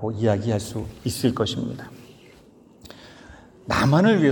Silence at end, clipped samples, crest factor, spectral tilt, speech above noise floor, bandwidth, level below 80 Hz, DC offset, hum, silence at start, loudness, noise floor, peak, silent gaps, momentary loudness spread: 0 s; under 0.1%; 18 dB; -6 dB/octave; 29 dB; 18 kHz; -52 dBFS; under 0.1%; none; 0 s; -23 LUFS; -51 dBFS; -6 dBFS; none; 26 LU